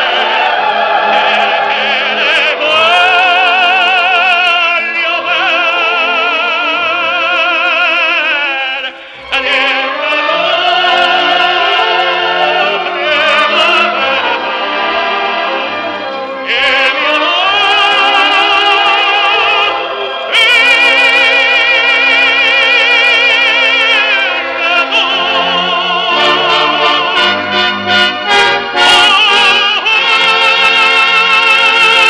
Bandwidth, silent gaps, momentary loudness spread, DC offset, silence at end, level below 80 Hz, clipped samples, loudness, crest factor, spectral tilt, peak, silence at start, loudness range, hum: 13.5 kHz; none; 7 LU; under 0.1%; 0 s; -54 dBFS; under 0.1%; -8 LUFS; 10 dB; -1.5 dB/octave; 0 dBFS; 0 s; 5 LU; none